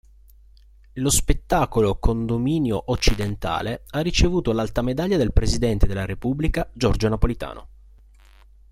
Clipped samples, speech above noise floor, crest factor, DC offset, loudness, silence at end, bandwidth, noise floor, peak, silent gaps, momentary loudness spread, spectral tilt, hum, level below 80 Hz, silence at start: under 0.1%; 29 dB; 20 dB; under 0.1%; -23 LUFS; 1.05 s; 15 kHz; -50 dBFS; -2 dBFS; none; 6 LU; -5 dB/octave; none; -28 dBFS; 0.95 s